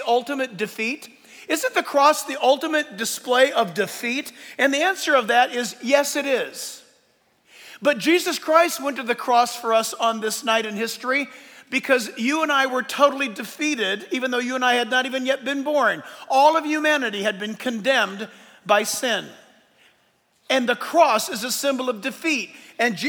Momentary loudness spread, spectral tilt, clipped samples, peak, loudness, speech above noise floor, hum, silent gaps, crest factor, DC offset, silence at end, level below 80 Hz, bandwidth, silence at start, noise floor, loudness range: 9 LU; -2 dB/octave; under 0.1%; -2 dBFS; -21 LUFS; 42 dB; none; none; 20 dB; under 0.1%; 0 s; -80 dBFS; over 20 kHz; 0 s; -63 dBFS; 2 LU